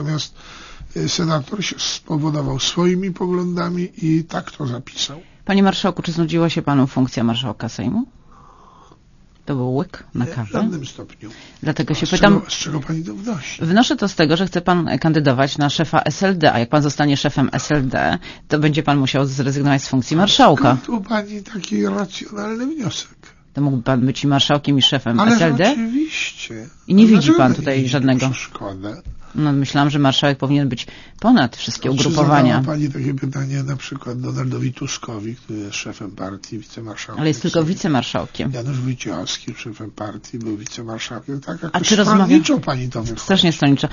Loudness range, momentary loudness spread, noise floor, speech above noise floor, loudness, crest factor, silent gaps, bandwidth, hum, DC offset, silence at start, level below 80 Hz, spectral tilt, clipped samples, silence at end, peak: 9 LU; 15 LU; -49 dBFS; 31 dB; -18 LUFS; 18 dB; none; 7.4 kHz; none; under 0.1%; 0 s; -44 dBFS; -5.5 dB/octave; under 0.1%; 0 s; 0 dBFS